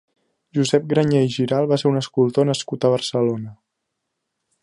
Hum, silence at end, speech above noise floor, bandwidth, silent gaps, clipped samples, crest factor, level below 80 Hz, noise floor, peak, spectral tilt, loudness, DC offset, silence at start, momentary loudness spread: none; 1.1 s; 59 dB; 11.5 kHz; none; under 0.1%; 18 dB; -62 dBFS; -78 dBFS; -4 dBFS; -6 dB/octave; -20 LUFS; under 0.1%; 0.55 s; 5 LU